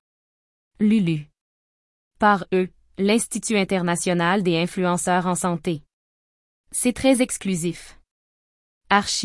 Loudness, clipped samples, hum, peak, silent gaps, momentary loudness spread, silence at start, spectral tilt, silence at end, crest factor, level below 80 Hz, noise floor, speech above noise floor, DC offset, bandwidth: -22 LUFS; under 0.1%; none; -2 dBFS; 1.41-2.11 s, 5.93-6.64 s, 8.11-8.81 s; 9 LU; 0.8 s; -4.5 dB/octave; 0 s; 20 dB; -54 dBFS; under -90 dBFS; over 69 dB; under 0.1%; 12 kHz